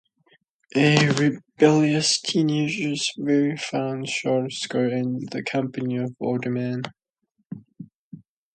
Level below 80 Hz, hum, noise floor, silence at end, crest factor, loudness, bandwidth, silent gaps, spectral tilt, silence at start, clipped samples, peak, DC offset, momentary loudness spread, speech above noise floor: -66 dBFS; none; -73 dBFS; 0.35 s; 24 dB; -23 LUFS; 9.4 kHz; 7.46-7.50 s, 7.95-8.11 s; -5 dB/octave; 0.75 s; under 0.1%; 0 dBFS; under 0.1%; 11 LU; 51 dB